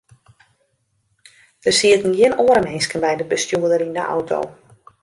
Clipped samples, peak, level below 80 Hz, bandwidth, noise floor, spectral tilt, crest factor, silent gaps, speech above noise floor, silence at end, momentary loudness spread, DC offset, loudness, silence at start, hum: under 0.1%; -2 dBFS; -56 dBFS; 11.5 kHz; -67 dBFS; -3 dB/octave; 18 dB; none; 49 dB; 0.5 s; 10 LU; under 0.1%; -17 LUFS; 1.65 s; none